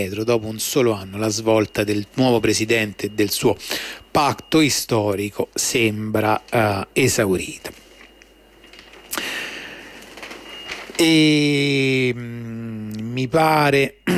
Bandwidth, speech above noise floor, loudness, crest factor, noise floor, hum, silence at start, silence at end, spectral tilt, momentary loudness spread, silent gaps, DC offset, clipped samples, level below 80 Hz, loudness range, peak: 16 kHz; 30 dB; -19 LUFS; 14 dB; -49 dBFS; none; 0 s; 0 s; -4 dB/octave; 15 LU; none; under 0.1%; under 0.1%; -52 dBFS; 6 LU; -6 dBFS